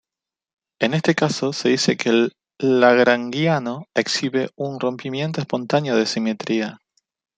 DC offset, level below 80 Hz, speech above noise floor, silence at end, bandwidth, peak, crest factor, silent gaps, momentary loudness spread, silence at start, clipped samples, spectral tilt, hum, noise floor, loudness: under 0.1%; -66 dBFS; 69 dB; 0.6 s; 9.4 kHz; -2 dBFS; 18 dB; none; 9 LU; 0.8 s; under 0.1%; -5 dB/octave; none; -89 dBFS; -20 LUFS